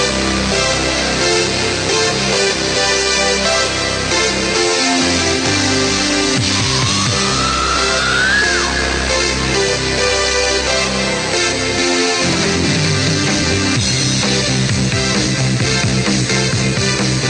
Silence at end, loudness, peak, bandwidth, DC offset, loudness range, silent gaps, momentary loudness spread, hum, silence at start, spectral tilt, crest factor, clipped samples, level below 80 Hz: 0 s; -14 LUFS; -2 dBFS; 10 kHz; under 0.1%; 1 LU; none; 2 LU; none; 0 s; -3 dB/octave; 12 dB; under 0.1%; -32 dBFS